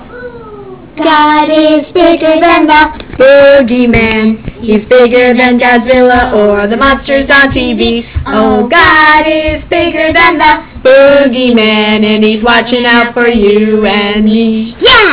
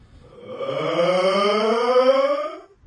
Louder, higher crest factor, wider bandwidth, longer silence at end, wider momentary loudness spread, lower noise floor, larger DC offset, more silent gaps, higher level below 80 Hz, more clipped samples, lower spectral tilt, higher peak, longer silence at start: first, -6 LUFS vs -19 LUFS; second, 6 dB vs 14 dB; second, 4 kHz vs 10 kHz; second, 0 s vs 0.25 s; second, 8 LU vs 14 LU; second, -27 dBFS vs -43 dBFS; first, 0.8% vs under 0.1%; neither; first, -28 dBFS vs -60 dBFS; first, 5% vs under 0.1%; first, -8.5 dB/octave vs -5 dB/octave; first, 0 dBFS vs -6 dBFS; second, 0 s vs 0.35 s